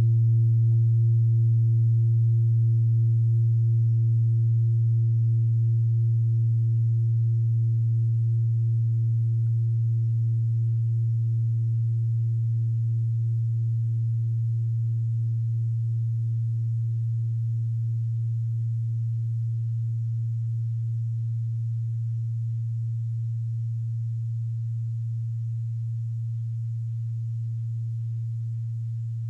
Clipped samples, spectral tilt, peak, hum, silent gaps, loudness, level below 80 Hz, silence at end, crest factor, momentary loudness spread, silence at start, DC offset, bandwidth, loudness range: under 0.1%; -11.5 dB/octave; -16 dBFS; none; none; -25 LUFS; -68 dBFS; 0 s; 8 dB; 9 LU; 0 s; under 0.1%; 0.4 kHz; 8 LU